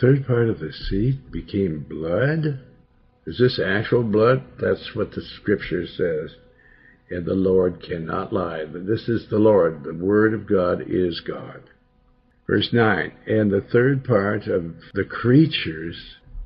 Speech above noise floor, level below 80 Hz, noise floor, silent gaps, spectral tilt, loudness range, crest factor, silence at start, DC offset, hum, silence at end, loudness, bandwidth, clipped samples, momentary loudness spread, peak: 38 dB; -46 dBFS; -59 dBFS; none; -10.5 dB/octave; 4 LU; 18 dB; 0 s; under 0.1%; none; 0 s; -22 LUFS; 5.8 kHz; under 0.1%; 12 LU; -4 dBFS